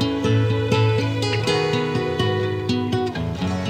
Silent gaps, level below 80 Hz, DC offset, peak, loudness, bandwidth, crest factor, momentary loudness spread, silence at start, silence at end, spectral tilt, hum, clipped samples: none; -48 dBFS; under 0.1%; -4 dBFS; -21 LUFS; 9.8 kHz; 16 dB; 4 LU; 0 s; 0 s; -6 dB/octave; none; under 0.1%